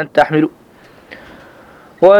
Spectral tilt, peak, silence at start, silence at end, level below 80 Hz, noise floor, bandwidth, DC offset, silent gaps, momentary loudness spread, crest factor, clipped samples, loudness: -7 dB/octave; 0 dBFS; 0 s; 0 s; -54 dBFS; -43 dBFS; 8.6 kHz; under 0.1%; none; 24 LU; 14 dB; 0.1%; -14 LUFS